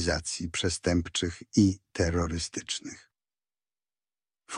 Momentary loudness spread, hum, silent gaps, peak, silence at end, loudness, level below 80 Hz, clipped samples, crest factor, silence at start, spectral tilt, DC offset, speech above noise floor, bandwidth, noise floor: 10 LU; none; none; -10 dBFS; 0 s; -29 LUFS; -46 dBFS; under 0.1%; 20 dB; 0 s; -4.5 dB/octave; under 0.1%; over 61 dB; 11 kHz; under -90 dBFS